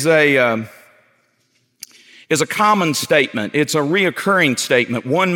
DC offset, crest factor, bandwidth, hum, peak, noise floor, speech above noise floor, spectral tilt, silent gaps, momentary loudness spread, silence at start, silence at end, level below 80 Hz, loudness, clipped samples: under 0.1%; 16 dB; 17.5 kHz; none; 0 dBFS; -63 dBFS; 47 dB; -4 dB/octave; none; 6 LU; 0 s; 0 s; -70 dBFS; -16 LUFS; under 0.1%